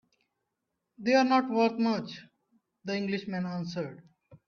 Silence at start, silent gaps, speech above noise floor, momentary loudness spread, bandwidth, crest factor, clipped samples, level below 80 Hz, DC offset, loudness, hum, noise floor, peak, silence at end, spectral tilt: 1 s; none; 55 dB; 17 LU; 7 kHz; 18 dB; under 0.1%; -76 dBFS; under 0.1%; -29 LUFS; none; -84 dBFS; -12 dBFS; 0.1 s; -6 dB/octave